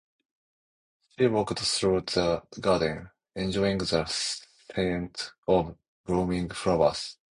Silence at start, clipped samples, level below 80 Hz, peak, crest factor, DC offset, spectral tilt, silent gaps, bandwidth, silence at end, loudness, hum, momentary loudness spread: 1.2 s; under 0.1%; -50 dBFS; -8 dBFS; 20 dB; under 0.1%; -4.5 dB/octave; 5.38-5.43 s, 5.88-6.04 s; 11 kHz; 0.25 s; -28 LUFS; none; 11 LU